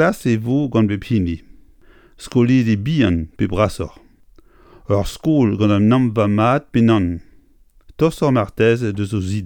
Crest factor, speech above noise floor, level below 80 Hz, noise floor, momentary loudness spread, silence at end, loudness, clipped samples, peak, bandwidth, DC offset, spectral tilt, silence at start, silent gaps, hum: 16 dB; 34 dB; -40 dBFS; -51 dBFS; 7 LU; 0 s; -17 LUFS; under 0.1%; -2 dBFS; 18 kHz; under 0.1%; -7.5 dB/octave; 0 s; none; none